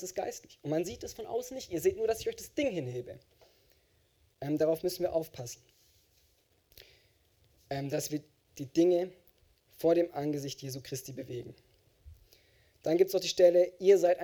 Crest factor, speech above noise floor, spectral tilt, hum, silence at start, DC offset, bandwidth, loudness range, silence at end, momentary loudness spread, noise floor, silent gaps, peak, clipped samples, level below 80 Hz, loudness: 20 dB; 39 dB; -5 dB/octave; none; 0 s; under 0.1%; over 20 kHz; 8 LU; 0 s; 18 LU; -70 dBFS; none; -12 dBFS; under 0.1%; -66 dBFS; -31 LUFS